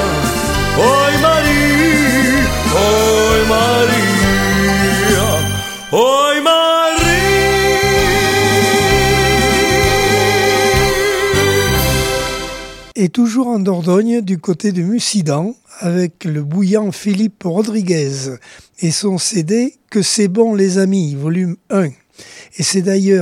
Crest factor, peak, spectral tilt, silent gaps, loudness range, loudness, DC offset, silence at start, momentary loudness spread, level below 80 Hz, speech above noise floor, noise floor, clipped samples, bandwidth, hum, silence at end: 14 dB; 0 dBFS; -4 dB/octave; none; 5 LU; -13 LUFS; under 0.1%; 0 s; 8 LU; -28 dBFS; 24 dB; -39 dBFS; under 0.1%; 17 kHz; none; 0 s